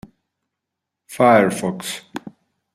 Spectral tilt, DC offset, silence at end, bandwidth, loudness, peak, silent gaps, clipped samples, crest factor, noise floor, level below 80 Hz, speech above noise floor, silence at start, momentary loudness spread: -5 dB/octave; under 0.1%; 0.45 s; 15.5 kHz; -17 LUFS; -2 dBFS; none; under 0.1%; 20 dB; -82 dBFS; -64 dBFS; 65 dB; 1.1 s; 22 LU